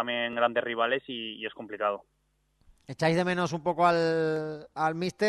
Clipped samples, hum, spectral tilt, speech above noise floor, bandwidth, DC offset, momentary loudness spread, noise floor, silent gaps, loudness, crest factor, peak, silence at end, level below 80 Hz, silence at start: under 0.1%; none; -5.5 dB/octave; 42 dB; 12 kHz; under 0.1%; 13 LU; -70 dBFS; none; -28 LUFS; 20 dB; -10 dBFS; 0 s; -68 dBFS; 0 s